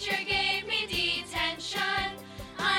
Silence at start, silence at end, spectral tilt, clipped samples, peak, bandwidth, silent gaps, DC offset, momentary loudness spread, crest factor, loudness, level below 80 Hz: 0 s; 0 s; -2 dB/octave; under 0.1%; -14 dBFS; 18 kHz; none; under 0.1%; 8 LU; 18 dB; -28 LUFS; -52 dBFS